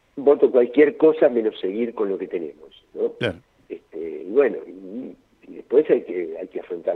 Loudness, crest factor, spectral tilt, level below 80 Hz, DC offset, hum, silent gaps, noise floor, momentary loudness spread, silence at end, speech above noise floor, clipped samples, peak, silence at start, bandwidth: -21 LUFS; 18 dB; -8 dB/octave; -66 dBFS; under 0.1%; none; none; -43 dBFS; 20 LU; 0 s; 23 dB; under 0.1%; -2 dBFS; 0.15 s; 4.2 kHz